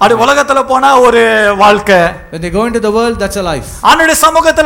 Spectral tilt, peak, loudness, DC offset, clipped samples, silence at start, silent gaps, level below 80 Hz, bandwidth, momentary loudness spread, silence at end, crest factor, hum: -3.5 dB/octave; 0 dBFS; -8 LUFS; under 0.1%; 0.2%; 0 s; none; -32 dBFS; 19 kHz; 9 LU; 0 s; 8 dB; none